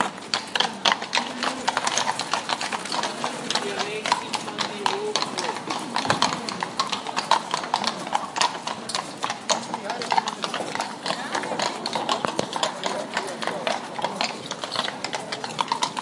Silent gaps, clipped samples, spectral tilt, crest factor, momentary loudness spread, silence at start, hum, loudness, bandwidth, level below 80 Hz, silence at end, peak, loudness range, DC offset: none; under 0.1%; -2 dB/octave; 26 dB; 6 LU; 0 s; none; -26 LUFS; 11.5 kHz; -72 dBFS; 0 s; -2 dBFS; 2 LU; under 0.1%